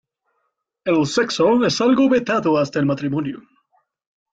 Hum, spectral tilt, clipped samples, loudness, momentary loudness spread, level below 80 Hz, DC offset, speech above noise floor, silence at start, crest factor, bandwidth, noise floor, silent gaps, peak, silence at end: none; -5.5 dB/octave; under 0.1%; -18 LUFS; 10 LU; -58 dBFS; under 0.1%; 55 dB; 0.85 s; 14 dB; 9 kHz; -73 dBFS; none; -6 dBFS; 0.95 s